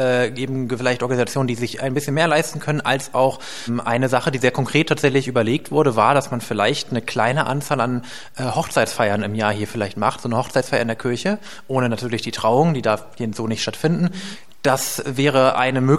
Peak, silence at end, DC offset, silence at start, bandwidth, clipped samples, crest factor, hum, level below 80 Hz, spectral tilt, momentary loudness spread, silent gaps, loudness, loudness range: -2 dBFS; 0 s; 1%; 0 s; 16 kHz; under 0.1%; 18 dB; none; -58 dBFS; -5 dB/octave; 8 LU; none; -20 LUFS; 3 LU